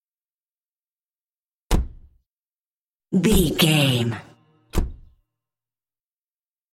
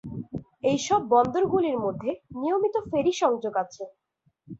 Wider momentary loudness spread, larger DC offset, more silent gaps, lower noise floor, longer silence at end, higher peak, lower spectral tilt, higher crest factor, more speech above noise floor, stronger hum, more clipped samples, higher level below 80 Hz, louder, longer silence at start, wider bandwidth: about the same, 17 LU vs 15 LU; neither; first, 2.30-3.00 s vs none; first, under -90 dBFS vs -60 dBFS; first, 1.75 s vs 0.05 s; first, -4 dBFS vs -8 dBFS; about the same, -5 dB/octave vs -5.5 dB/octave; about the same, 22 dB vs 18 dB; first, over 71 dB vs 35 dB; neither; neither; first, -32 dBFS vs -58 dBFS; first, -21 LUFS vs -25 LUFS; first, 1.7 s vs 0.05 s; first, 16.5 kHz vs 8 kHz